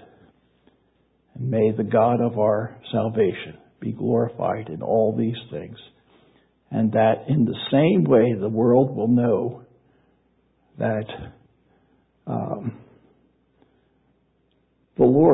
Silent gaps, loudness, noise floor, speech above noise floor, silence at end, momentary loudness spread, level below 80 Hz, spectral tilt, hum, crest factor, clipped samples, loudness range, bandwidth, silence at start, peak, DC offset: none; -22 LUFS; -65 dBFS; 45 dB; 0 s; 17 LU; -58 dBFS; -12.5 dB/octave; none; 18 dB; under 0.1%; 13 LU; 4 kHz; 1.35 s; -4 dBFS; under 0.1%